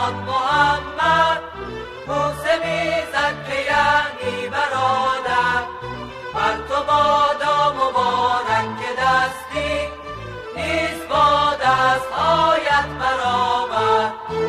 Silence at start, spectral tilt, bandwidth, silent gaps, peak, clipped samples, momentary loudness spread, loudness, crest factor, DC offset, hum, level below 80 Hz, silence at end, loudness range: 0 s; -4 dB/octave; 15.5 kHz; none; -6 dBFS; under 0.1%; 11 LU; -19 LUFS; 14 dB; under 0.1%; none; -44 dBFS; 0 s; 3 LU